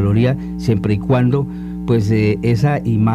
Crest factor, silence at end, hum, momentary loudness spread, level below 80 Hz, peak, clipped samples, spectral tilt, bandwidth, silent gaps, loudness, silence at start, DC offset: 12 dB; 0 s; none; 5 LU; -36 dBFS; -2 dBFS; under 0.1%; -8.5 dB/octave; 9.4 kHz; none; -17 LUFS; 0 s; under 0.1%